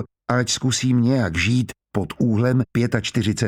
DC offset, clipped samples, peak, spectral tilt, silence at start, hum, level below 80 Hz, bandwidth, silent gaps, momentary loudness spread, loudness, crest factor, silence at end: under 0.1%; under 0.1%; -4 dBFS; -5 dB/octave; 0 s; none; -46 dBFS; 14.5 kHz; none; 5 LU; -21 LUFS; 16 dB; 0 s